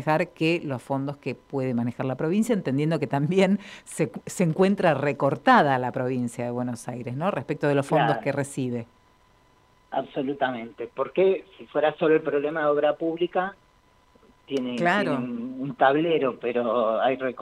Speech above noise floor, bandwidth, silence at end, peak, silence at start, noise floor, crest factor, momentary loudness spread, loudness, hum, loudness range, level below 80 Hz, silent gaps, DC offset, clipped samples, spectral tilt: 35 dB; 15.5 kHz; 0 s; -6 dBFS; 0 s; -60 dBFS; 20 dB; 10 LU; -25 LUFS; none; 5 LU; -64 dBFS; none; under 0.1%; under 0.1%; -6.5 dB/octave